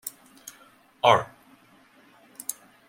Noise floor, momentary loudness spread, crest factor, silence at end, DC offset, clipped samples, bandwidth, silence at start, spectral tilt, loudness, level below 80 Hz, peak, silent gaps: -57 dBFS; 25 LU; 26 dB; 0.35 s; under 0.1%; under 0.1%; 16.5 kHz; 0.05 s; -2.5 dB/octave; -24 LUFS; -68 dBFS; -4 dBFS; none